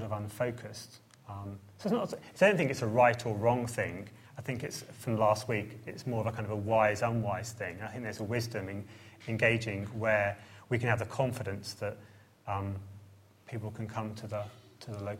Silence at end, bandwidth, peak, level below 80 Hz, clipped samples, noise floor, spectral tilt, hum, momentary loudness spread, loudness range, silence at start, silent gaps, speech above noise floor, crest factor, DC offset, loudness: 0 s; 16 kHz; -12 dBFS; -66 dBFS; under 0.1%; -57 dBFS; -6 dB/octave; none; 18 LU; 7 LU; 0 s; none; 25 dB; 22 dB; under 0.1%; -32 LUFS